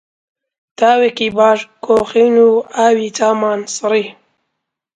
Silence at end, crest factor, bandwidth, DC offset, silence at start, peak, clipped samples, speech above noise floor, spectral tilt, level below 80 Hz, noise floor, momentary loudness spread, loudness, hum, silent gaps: 0.85 s; 14 dB; 9.4 kHz; under 0.1%; 0.8 s; 0 dBFS; under 0.1%; 62 dB; -3.5 dB/octave; -58 dBFS; -75 dBFS; 7 LU; -13 LUFS; none; none